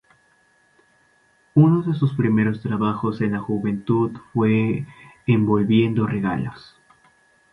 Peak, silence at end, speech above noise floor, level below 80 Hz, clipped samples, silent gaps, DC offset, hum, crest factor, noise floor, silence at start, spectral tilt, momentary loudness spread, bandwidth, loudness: -2 dBFS; 0.95 s; 40 dB; -54 dBFS; under 0.1%; none; under 0.1%; none; 18 dB; -60 dBFS; 1.55 s; -9.5 dB/octave; 8 LU; 5 kHz; -21 LUFS